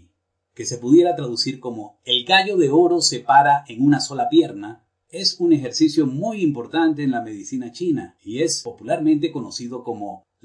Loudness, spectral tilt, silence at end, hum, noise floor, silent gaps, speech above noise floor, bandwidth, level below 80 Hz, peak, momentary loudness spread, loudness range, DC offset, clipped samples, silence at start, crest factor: -19 LUFS; -4 dB/octave; 0.25 s; none; -69 dBFS; none; 50 dB; 10.5 kHz; -66 dBFS; -2 dBFS; 15 LU; 6 LU; under 0.1%; under 0.1%; 0.6 s; 18 dB